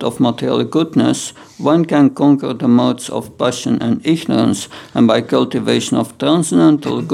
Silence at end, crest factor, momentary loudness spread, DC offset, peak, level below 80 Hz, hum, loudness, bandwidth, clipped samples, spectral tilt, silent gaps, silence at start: 0 s; 14 dB; 8 LU; under 0.1%; 0 dBFS; -58 dBFS; none; -15 LUFS; 14 kHz; under 0.1%; -5.5 dB/octave; none; 0 s